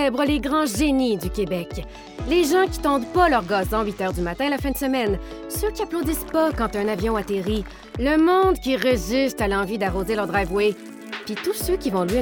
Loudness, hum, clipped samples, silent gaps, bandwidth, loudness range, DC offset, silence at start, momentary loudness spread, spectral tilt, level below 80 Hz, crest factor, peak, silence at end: -22 LUFS; none; under 0.1%; none; 19.5 kHz; 3 LU; under 0.1%; 0 s; 10 LU; -5 dB/octave; -36 dBFS; 18 dB; -4 dBFS; 0 s